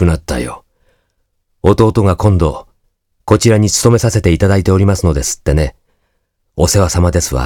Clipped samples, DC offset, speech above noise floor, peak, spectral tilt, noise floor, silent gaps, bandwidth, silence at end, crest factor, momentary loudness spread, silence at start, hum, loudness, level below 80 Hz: under 0.1%; under 0.1%; 53 dB; 0 dBFS; -5.5 dB/octave; -64 dBFS; none; 17.5 kHz; 0 s; 12 dB; 10 LU; 0 s; none; -12 LUFS; -24 dBFS